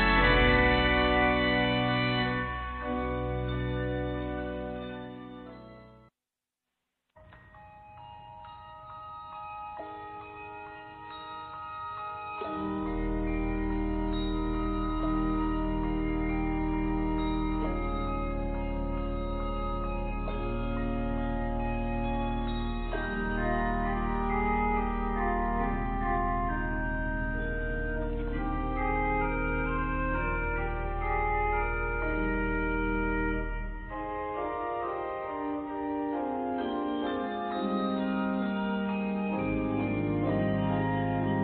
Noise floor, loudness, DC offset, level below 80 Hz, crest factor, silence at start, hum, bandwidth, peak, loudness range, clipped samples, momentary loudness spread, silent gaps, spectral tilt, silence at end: under -90 dBFS; -31 LUFS; under 0.1%; -36 dBFS; 20 dB; 0 s; none; 4.5 kHz; -12 dBFS; 13 LU; under 0.1%; 13 LU; none; -10 dB/octave; 0 s